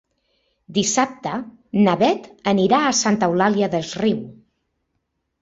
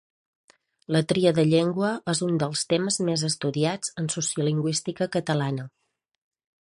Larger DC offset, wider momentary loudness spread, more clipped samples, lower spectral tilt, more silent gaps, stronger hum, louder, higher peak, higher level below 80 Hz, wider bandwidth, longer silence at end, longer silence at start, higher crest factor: neither; first, 11 LU vs 6 LU; neither; about the same, -4 dB/octave vs -5 dB/octave; neither; neither; first, -19 LUFS vs -25 LUFS; first, -2 dBFS vs -8 dBFS; first, -60 dBFS vs -66 dBFS; second, 8 kHz vs 11.5 kHz; about the same, 1.1 s vs 1 s; second, 0.7 s vs 0.9 s; about the same, 18 dB vs 18 dB